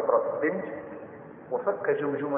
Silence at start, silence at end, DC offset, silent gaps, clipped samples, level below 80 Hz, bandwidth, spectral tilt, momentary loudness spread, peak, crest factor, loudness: 0 s; 0 s; under 0.1%; none; under 0.1%; -72 dBFS; 3.6 kHz; -11 dB/octave; 17 LU; -10 dBFS; 18 dB; -29 LUFS